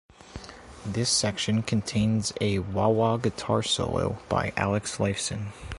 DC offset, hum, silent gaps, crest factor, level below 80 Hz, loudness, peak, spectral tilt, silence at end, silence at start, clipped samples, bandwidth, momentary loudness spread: under 0.1%; none; none; 18 dB; -46 dBFS; -26 LUFS; -8 dBFS; -4.5 dB/octave; 0 s; 0.25 s; under 0.1%; 11.5 kHz; 15 LU